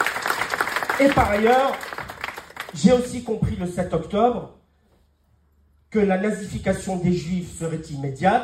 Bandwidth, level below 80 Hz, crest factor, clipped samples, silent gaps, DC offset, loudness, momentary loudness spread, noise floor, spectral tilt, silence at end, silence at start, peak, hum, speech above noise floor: 16 kHz; -44 dBFS; 18 dB; under 0.1%; none; under 0.1%; -22 LUFS; 14 LU; -61 dBFS; -5.5 dB/octave; 0 s; 0 s; -4 dBFS; none; 40 dB